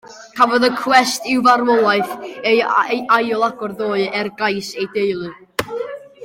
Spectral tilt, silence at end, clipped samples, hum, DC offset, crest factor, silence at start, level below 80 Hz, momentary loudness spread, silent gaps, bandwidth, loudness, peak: -3.5 dB/octave; 0 s; under 0.1%; none; under 0.1%; 16 dB; 0.05 s; -60 dBFS; 12 LU; none; 16.5 kHz; -17 LUFS; 0 dBFS